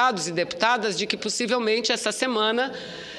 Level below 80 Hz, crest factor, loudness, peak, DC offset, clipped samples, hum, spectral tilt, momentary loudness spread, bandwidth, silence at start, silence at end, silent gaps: -68 dBFS; 20 dB; -24 LUFS; -6 dBFS; under 0.1%; under 0.1%; none; -2.5 dB/octave; 4 LU; 13 kHz; 0 s; 0 s; none